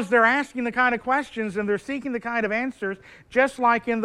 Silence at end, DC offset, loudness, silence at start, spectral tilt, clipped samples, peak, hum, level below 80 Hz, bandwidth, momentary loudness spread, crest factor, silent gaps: 0 s; under 0.1%; -23 LUFS; 0 s; -5 dB/octave; under 0.1%; -6 dBFS; none; -58 dBFS; 12 kHz; 9 LU; 18 dB; none